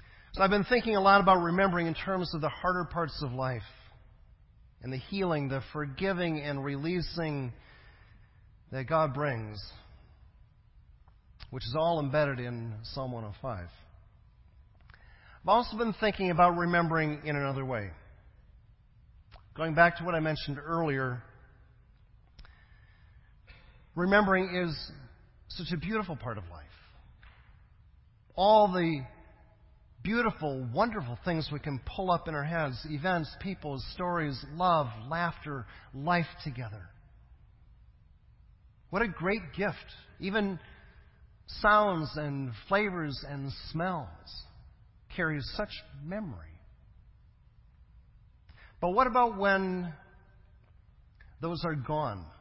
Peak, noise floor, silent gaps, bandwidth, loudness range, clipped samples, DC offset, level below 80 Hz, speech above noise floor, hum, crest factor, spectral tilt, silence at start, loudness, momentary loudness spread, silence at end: -8 dBFS; -60 dBFS; none; 5.8 kHz; 9 LU; under 0.1%; under 0.1%; -52 dBFS; 30 dB; none; 24 dB; -10 dB/octave; 0.15 s; -30 LUFS; 18 LU; 0.05 s